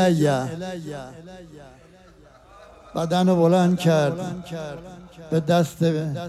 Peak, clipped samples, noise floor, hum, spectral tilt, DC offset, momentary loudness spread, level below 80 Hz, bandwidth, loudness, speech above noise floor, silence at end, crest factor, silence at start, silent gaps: -6 dBFS; under 0.1%; -50 dBFS; none; -7 dB/octave; under 0.1%; 23 LU; -56 dBFS; 13.5 kHz; -22 LUFS; 28 dB; 0 s; 16 dB; 0 s; none